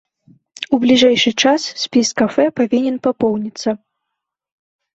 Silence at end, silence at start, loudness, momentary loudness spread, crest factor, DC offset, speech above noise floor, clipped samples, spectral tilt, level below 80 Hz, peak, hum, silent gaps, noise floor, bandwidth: 1.2 s; 0.6 s; -15 LUFS; 11 LU; 14 dB; under 0.1%; 64 dB; under 0.1%; -3.5 dB/octave; -60 dBFS; -2 dBFS; none; none; -79 dBFS; 8 kHz